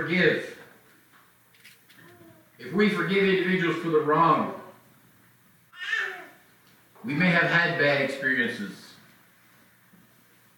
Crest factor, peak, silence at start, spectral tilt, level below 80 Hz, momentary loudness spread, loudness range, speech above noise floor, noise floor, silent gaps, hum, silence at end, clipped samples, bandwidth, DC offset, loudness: 20 dB; -8 dBFS; 0 s; -6 dB/octave; -70 dBFS; 19 LU; 4 LU; 35 dB; -59 dBFS; none; none; 1.65 s; under 0.1%; 19 kHz; under 0.1%; -24 LUFS